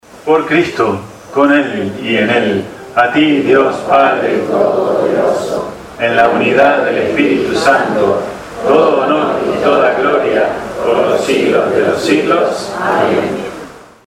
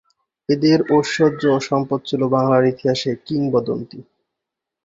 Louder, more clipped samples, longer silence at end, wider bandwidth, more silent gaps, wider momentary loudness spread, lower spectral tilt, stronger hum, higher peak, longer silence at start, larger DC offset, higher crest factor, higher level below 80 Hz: first, -12 LUFS vs -18 LUFS; neither; second, 0.25 s vs 0.85 s; first, 15 kHz vs 7.8 kHz; neither; about the same, 8 LU vs 8 LU; second, -5 dB/octave vs -6.5 dB/octave; neither; about the same, 0 dBFS vs -2 dBFS; second, 0.15 s vs 0.5 s; neither; second, 12 dB vs 18 dB; first, -48 dBFS vs -58 dBFS